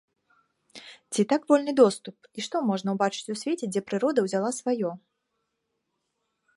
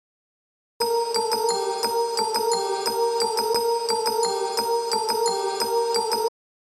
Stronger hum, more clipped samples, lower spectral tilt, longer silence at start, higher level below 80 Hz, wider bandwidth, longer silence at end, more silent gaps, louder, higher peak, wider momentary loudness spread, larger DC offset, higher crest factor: neither; neither; first, -5 dB/octave vs -1 dB/octave; about the same, 0.75 s vs 0.8 s; about the same, -78 dBFS vs -74 dBFS; second, 11.5 kHz vs 19.5 kHz; first, 1.6 s vs 0.4 s; neither; second, -26 LUFS vs -23 LUFS; first, -6 dBFS vs -10 dBFS; first, 19 LU vs 2 LU; neither; first, 20 dB vs 14 dB